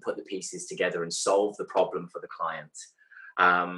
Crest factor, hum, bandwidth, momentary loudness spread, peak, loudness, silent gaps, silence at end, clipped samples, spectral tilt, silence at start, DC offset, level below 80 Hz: 20 dB; none; 12 kHz; 17 LU; -8 dBFS; -28 LUFS; none; 0 s; under 0.1%; -3 dB/octave; 0.05 s; under 0.1%; -78 dBFS